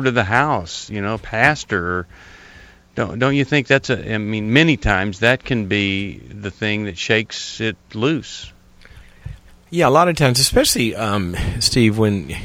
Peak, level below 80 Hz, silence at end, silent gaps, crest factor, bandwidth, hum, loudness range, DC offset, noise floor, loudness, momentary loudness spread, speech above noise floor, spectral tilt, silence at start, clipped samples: 0 dBFS; -38 dBFS; 0 s; none; 18 dB; 16.5 kHz; none; 6 LU; under 0.1%; -45 dBFS; -18 LUFS; 14 LU; 26 dB; -4.5 dB/octave; 0 s; under 0.1%